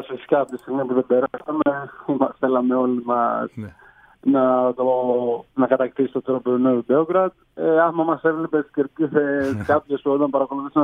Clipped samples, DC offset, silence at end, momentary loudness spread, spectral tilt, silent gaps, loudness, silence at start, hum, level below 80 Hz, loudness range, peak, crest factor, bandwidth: under 0.1%; under 0.1%; 0 s; 7 LU; -8.5 dB/octave; none; -21 LUFS; 0 s; none; -62 dBFS; 2 LU; -2 dBFS; 18 dB; 5.2 kHz